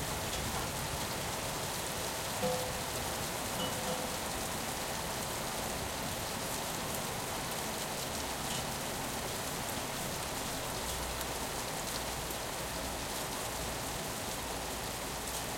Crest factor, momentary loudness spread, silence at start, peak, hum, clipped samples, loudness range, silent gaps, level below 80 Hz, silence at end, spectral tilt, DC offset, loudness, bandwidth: 18 dB; 2 LU; 0 s; -20 dBFS; none; under 0.1%; 1 LU; none; -52 dBFS; 0 s; -2.5 dB/octave; under 0.1%; -36 LUFS; 16.5 kHz